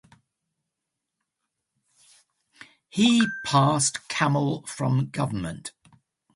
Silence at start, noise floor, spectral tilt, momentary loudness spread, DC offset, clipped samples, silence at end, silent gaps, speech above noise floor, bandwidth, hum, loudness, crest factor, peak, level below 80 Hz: 2.95 s; -84 dBFS; -4.5 dB/octave; 14 LU; under 0.1%; under 0.1%; 0.65 s; none; 61 dB; 11.5 kHz; none; -24 LUFS; 20 dB; -6 dBFS; -60 dBFS